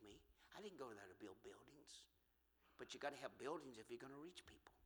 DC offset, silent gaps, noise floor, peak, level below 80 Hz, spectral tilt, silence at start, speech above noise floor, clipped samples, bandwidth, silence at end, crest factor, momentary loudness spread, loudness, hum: under 0.1%; none; -82 dBFS; -34 dBFS; -82 dBFS; -3.5 dB/octave; 0 s; 26 dB; under 0.1%; 19.5 kHz; 0 s; 24 dB; 13 LU; -57 LUFS; none